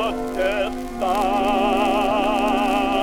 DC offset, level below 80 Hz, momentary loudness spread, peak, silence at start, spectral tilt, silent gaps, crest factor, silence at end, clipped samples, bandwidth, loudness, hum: under 0.1%; -38 dBFS; 5 LU; -6 dBFS; 0 s; -4.5 dB/octave; none; 14 dB; 0 s; under 0.1%; 17.5 kHz; -21 LUFS; none